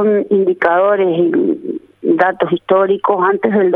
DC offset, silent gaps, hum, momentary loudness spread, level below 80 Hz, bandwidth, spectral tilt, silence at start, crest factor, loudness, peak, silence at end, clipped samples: under 0.1%; none; none; 6 LU; -62 dBFS; 4.3 kHz; -9 dB/octave; 0 s; 14 dB; -14 LUFS; 0 dBFS; 0 s; under 0.1%